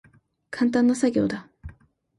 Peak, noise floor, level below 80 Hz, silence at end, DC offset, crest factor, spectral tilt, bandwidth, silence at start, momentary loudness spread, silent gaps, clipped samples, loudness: -10 dBFS; -53 dBFS; -52 dBFS; 0.5 s; under 0.1%; 16 dB; -5.5 dB/octave; 11.5 kHz; 0.5 s; 17 LU; none; under 0.1%; -23 LUFS